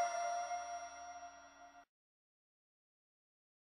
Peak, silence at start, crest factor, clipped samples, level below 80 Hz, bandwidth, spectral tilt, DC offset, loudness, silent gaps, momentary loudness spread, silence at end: -28 dBFS; 0 s; 20 dB; under 0.1%; -82 dBFS; 10.5 kHz; 0 dB/octave; under 0.1%; -44 LUFS; none; 20 LU; 1.85 s